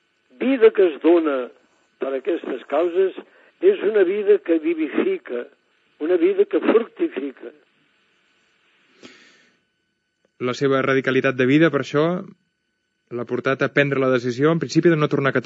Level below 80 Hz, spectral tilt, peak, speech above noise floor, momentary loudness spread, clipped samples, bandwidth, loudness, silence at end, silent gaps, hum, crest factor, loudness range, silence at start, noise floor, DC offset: -82 dBFS; -7 dB/octave; -2 dBFS; 54 dB; 14 LU; under 0.1%; 7.8 kHz; -20 LUFS; 0 s; none; none; 18 dB; 6 LU; 0.4 s; -73 dBFS; under 0.1%